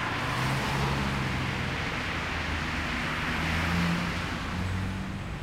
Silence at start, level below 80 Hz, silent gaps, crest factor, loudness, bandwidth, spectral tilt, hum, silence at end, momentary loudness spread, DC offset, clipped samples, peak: 0 s; -40 dBFS; none; 14 dB; -30 LUFS; 16 kHz; -5 dB/octave; none; 0 s; 5 LU; under 0.1%; under 0.1%; -16 dBFS